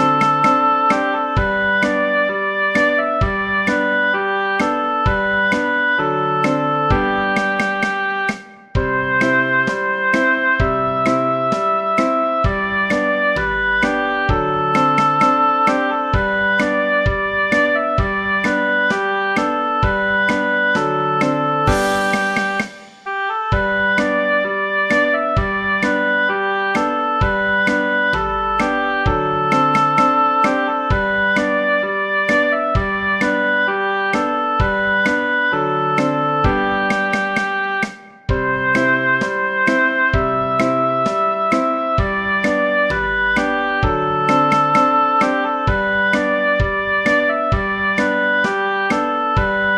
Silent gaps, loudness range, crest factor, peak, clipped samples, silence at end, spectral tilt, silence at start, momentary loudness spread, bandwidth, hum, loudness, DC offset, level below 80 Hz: none; 2 LU; 16 dB; -2 dBFS; under 0.1%; 0 s; -5.5 dB/octave; 0 s; 4 LU; 14 kHz; none; -17 LUFS; under 0.1%; -32 dBFS